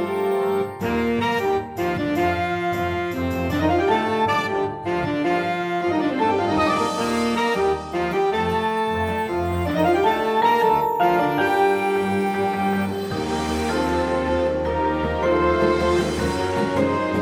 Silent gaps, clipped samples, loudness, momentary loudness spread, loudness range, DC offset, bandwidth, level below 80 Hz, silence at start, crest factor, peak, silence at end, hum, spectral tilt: none; under 0.1%; -21 LUFS; 5 LU; 3 LU; under 0.1%; 20 kHz; -42 dBFS; 0 s; 14 dB; -6 dBFS; 0 s; none; -6 dB/octave